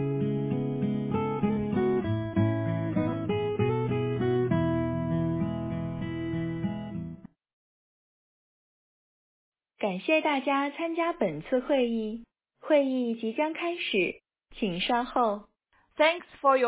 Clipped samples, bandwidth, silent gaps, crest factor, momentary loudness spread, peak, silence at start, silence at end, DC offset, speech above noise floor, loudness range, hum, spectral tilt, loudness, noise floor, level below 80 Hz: under 0.1%; 4 kHz; 7.53-9.52 s; 20 dB; 9 LU; -10 dBFS; 0 s; 0 s; under 0.1%; over 63 dB; 9 LU; none; -5.5 dB/octave; -29 LUFS; under -90 dBFS; -52 dBFS